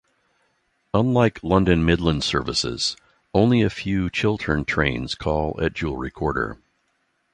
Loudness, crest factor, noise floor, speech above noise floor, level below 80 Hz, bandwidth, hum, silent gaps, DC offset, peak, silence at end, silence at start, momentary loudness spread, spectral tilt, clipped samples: -22 LUFS; 20 dB; -69 dBFS; 48 dB; -38 dBFS; 11 kHz; none; none; under 0.1%; -4 dBFS; 0.8 s; 0.95 s; 8 LU; -5.5 dB/octave; under 0.1%